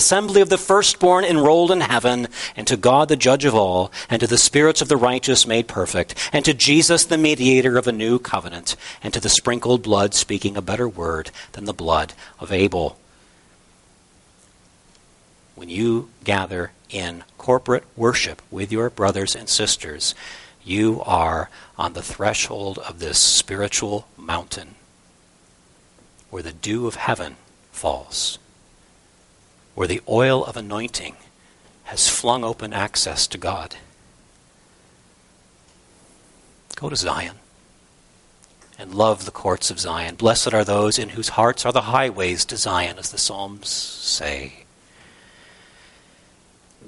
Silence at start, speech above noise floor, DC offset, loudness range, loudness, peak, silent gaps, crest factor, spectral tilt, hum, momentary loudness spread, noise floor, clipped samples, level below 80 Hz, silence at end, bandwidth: 0 s; 35 dB; under 0.1%; 13 LU; -19 LUFS; -2 dBFS; none; 20 dB; -3 dB/octave; none; 15 LU; -55 dBFS; under 0.1%; -48 dBFS; 2.35 s; 11.5 kHz